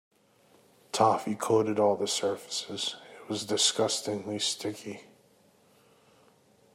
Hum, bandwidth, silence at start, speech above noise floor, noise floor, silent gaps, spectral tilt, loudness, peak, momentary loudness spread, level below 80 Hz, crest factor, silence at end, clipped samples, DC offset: none; 16 kHz; 0.95 s; 34 dB; -63 dBFS; none; -3 dB/octave; -29 LUFS; -8 dBFS; 12 LU; -78 dBFS; 22 dB; 1.7 s; under 0.1%; under 0.1%